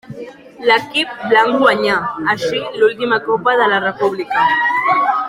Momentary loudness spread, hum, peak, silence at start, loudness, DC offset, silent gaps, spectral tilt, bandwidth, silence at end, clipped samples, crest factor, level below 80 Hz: 7 LU; none; 0 dBFS; 0.1 s; -15 LUFS; under 0.1%; none; -4.5 dB/octave; 15 kHz; 0 s; under 0.1%; 16 dB; -58 dBFS